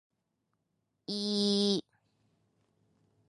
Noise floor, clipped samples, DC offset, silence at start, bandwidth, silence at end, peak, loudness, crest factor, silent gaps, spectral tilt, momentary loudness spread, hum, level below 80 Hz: -82 dBFS; under 0.1%; under 0.1%; 1.1 s; 11.5 kHz; 1.5 s; -16 dBFS; -31 LUFS; 20 dB; none; -5 dB/octave; 11 LU; none; -82 dBFS